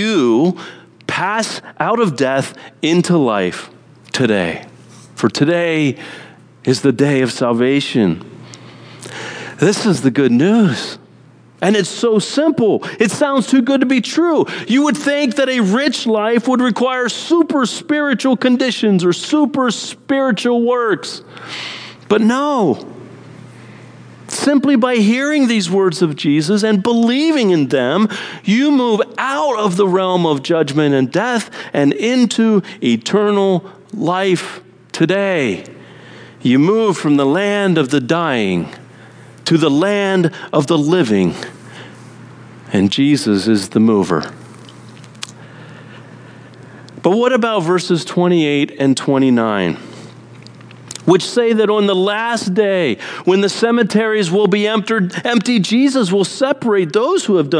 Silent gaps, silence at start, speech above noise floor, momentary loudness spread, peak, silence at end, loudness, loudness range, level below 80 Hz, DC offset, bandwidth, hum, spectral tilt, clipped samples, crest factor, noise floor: none; 0 s; 30 dB; 12 LU; 0 dBFS; 0 s; -15 LUFS; 3 LU; -62 dBFS; under 0.1%; 10.5 kHz; none; -5.5 dB/octave; under 0.1%; 16 dB; -44 dBFS